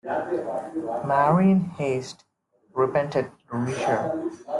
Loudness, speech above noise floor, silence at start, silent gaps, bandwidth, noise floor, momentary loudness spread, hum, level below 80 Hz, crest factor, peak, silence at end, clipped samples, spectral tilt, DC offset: -25 LUFS; 24 dB; 0.05 s; none; 11 kHz; -47 dBFS; 11 LU; none; -64 dBFS; 18 dB; -8 dBFS; 0 s; under 0.1%; -7.5 dB/octave; under 0.1%